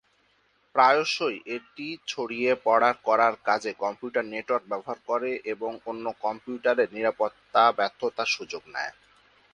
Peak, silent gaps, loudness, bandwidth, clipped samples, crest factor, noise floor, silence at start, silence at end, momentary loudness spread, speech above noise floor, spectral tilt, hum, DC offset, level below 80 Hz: -6 dBFS; none; -26 LUFS; 11 kHz; under 0.1%; 22 dB; -67 dBFS; 0.75 s; 0.6 s; 12 LU; 40 dB; -3 dB/octave; none; under 0.1%; -74 dBFS